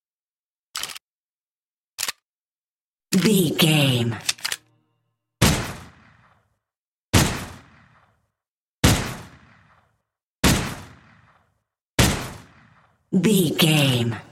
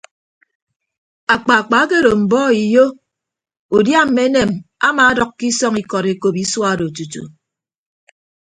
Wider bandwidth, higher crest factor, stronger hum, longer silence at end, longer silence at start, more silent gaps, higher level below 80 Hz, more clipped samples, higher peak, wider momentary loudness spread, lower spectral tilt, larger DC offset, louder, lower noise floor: first, 16.5 kHz vs 10.5 kHz; first, 22 dB vs 16 dB; neither; second, 0.1 s vs 1.25 s; second, 0.75 s vs 1.3 s; first, 1.01-1.98 s, 2.24-2.98 s, 6.78-7.07 s, 8.48-8.83 s, 10.25-10.43 s, 11.81-11.98 s vs 3.59-3.69 s; first, -38 dBFS vs -50 dBFS; neither; about the same, -2 dBFS vs 0 dBFS; first, 17 LU vs 8 LU; about the same, -4 dB/octave vs -4 dB/octave; neither; second, -21 LUFS vs -14 LUFS; first, under -90 dBFS vs -82 dBFS